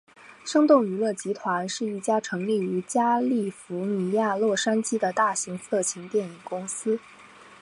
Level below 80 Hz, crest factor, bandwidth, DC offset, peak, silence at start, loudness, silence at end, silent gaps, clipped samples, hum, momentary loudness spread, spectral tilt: -76 dBFS; 20 dB; 11.5 kHz; under 0.1%; -6 dBFS; 0.25 s; -25 LUFS; 0.05 s; none; under 0.1%; none; 9 LU; -4.5 dB/octave